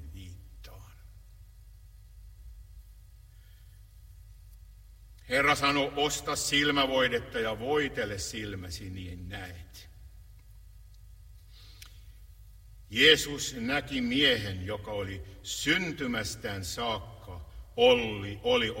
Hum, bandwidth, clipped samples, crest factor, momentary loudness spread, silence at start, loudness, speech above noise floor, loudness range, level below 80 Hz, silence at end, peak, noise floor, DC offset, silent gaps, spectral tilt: none; 16 kHz; under 0.1%; 26 dB; 24 LU; 0 s; -28 LUFS; 23 dB; 15 LU; -50 dBFS; 0 s; -6 dBFS; -53 dBFS; under 0.1%; none; -3 dB/octave